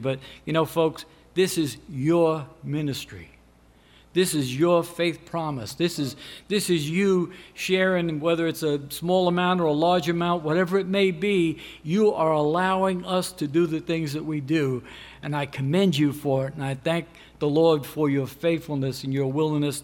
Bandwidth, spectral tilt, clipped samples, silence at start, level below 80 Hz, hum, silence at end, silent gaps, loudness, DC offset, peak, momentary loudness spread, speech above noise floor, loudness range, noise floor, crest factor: 17 kHz; -5.5 dB/octave; under 0.1%; 0 s; -58 dBFS; none; 0 s; none; -24 LUFS; under 0.1%; -8 dBFS; 9 LU; 31 dB; 3 LU; -55 dBFS; 16 dB